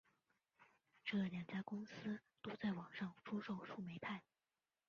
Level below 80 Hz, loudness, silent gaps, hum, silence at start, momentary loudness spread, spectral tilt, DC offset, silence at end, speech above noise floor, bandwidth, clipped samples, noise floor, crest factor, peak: -84 dBFS; -48 LUFS; none; none; 0.6 s; 7 LU; -5 dB/octave; under 0.1%; 0.65 s; over 43 dB; 6.8 kHz; under 0.1%; under -90 dBFS; 16 dB; -32 dBFS